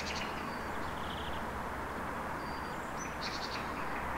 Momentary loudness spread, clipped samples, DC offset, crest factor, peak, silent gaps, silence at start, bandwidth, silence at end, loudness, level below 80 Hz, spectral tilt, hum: 2 LU; under 0.1%; under 0.1%; 14 dB; -24 dBFS; none; 0 s; 16 kHz; 0 s; -39 LUFS; -52 dBFS; -4 dB/octave; none